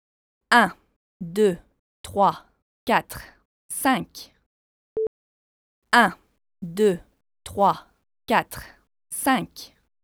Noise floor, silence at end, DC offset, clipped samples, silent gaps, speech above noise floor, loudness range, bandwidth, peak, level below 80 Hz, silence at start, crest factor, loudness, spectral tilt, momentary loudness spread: under -90 dBFS; 0.4 s; under 0.1%; under 0.1%; 0.96-1.20 s, 1.79-2.04 s, 2.62-2.87 s, 3.45-3.69 s, 4.46-4.96 s, 5.07-5.82 s; over 68 dB; 3 LU; over 20 kHz; -2 dBFS; -56 dBFS; 0.5 s; 24 dB; -23 LUFS; -4 dB/octave; 21 LU